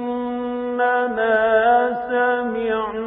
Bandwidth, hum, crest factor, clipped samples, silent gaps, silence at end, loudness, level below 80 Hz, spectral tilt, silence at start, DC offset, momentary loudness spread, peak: 3.9 kHz; none; 14 dB; under 0.1%; none; 0 s; -19 LUFS; -54 dBFS; -9.5 dB/octave; 0 s; under 0.1%; 9 LU; -6 dBFS